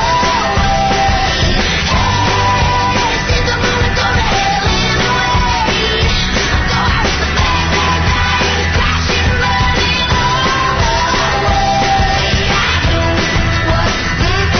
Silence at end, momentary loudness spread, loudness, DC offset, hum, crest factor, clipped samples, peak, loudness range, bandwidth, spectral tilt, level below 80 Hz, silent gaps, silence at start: 0 s; 1 LU; -12 LUFS; under 0.1%; none; 10 dB; under 0.1%; -2 dBFS; 0 LU; 6.6 kHz; -4 dB/octave; -20 dBFS; none; 0 s